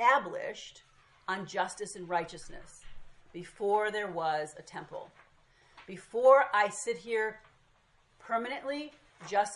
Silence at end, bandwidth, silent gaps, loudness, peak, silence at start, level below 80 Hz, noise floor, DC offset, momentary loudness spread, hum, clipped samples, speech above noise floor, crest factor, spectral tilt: 0 s; 11.5 kHz; none; -31 LUFS; -10 dBFS; 0 s; -66 dBFS; -67 dBFS; under 0.1%; 22 LU; none; under 0.1%; 35 dB; 22 dB; -3 dB/octave